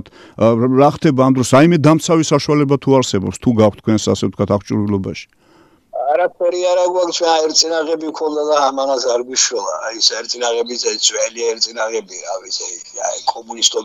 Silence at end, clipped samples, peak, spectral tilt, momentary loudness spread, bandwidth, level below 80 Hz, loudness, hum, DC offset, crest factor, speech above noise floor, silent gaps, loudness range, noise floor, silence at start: 0 s; under 0.1%; 0 dBFS; -4 dB/octave; 10 LU; 15.5 kHz; -52 dBFS; -15 LUFS; none; under 0.1%; 16 dB; 35 dB; none; 5 LU; -50 dBFS; 0.05 s